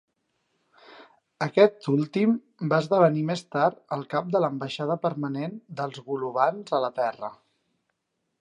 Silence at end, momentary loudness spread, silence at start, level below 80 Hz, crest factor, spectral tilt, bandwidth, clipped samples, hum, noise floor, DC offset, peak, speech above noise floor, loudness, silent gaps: 1.1 s; 13 LU; 0.9 s; -78 dBFS; 22 dB; -7 dB/octave; 11 kHz; under 0.1%; none; -79 dBFS; under 0.1%; -4 dBFS; 54 dB; -26 LUFS; none